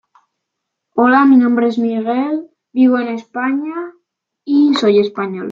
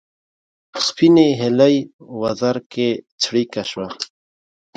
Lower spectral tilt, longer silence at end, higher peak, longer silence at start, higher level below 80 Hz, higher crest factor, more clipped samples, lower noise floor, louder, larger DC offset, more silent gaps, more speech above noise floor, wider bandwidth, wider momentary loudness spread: first, -6.5 dB/octave vs -5 dB/octave; second, 0 s vs 0.7 s; about the same, -2 dBFS vs -2 dBFS; first, 0.95 s vs 0.75 s; about the same, -66 dBFS vs -62 dBFS; about the same, 14 dB vs 18 dB; neither; second, -77 dBFS vs under -90 dBFS; first, -15 LUFS vs -18 LUFS; neither; second, none vs 1.93-1.99 s, 2.66-2.70 s, 3.12-3.18 s; second, 64 dB vs over 73 dB; second, 7.6 kHz vs 9.2 kHz; about the same, 14 LU vs 16 LU